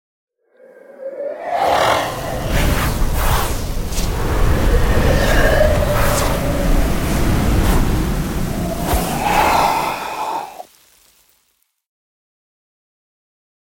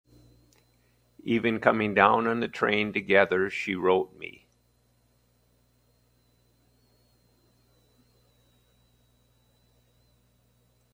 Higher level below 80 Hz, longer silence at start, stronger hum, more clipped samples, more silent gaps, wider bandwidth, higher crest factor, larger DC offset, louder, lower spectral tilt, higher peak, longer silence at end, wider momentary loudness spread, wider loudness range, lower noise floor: first, -22 dBFS vs -68 dBFS; second, 0.9 s vs 1.25 s; second, none vs 60 Hz at -60 dBFS; neither; neither; about the same, 17 kHz vs 16 kHz; second, 14 dB vs 28 dB; neither; first, -18 LUFS vs -25 LUFS; about the same, -5 dB/octave vs -6 dB/octave; about the same, -2 dBFS vs -2 dBFS; second, 3 s vs 6.65 s; second, 10 LU vs 13 LU; second, 4 LU vs 9 LU; about the same, -64 dBFS vs -67 dBFS